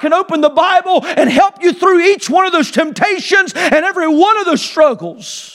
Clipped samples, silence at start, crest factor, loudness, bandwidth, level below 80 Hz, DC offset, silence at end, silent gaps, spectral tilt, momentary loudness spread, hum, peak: under 0.1%; 0 s; 12 dB; -12 LUFS; 13.5 kHz; -58 dBFS; under 0.1%; 0.05 s; none; -3.5 dB/octave; 5 LU; none; 0 dBFS